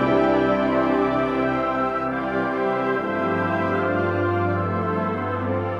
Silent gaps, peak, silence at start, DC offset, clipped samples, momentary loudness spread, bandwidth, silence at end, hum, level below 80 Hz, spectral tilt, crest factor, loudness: none; -8 dBFS; 0 s; under 0.1%; under 0.1%; 5 LU; 7.4 kHz; 0 s; none; -50 dBFS; -8.5 dB/octave; 14 dB; -22 LUFS